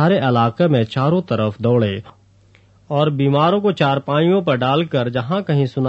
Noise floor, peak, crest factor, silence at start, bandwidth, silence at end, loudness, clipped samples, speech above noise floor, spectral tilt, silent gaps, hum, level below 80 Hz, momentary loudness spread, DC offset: -51 dBFS; -2 dBFS; 14 dB; 0 s; 7.6 kHz; 0 s; -17 LUFS; under 0.1%; 35 dB; -8.5 dB/octave; none; none; -56 dBFS; 5 LU; under 0.1%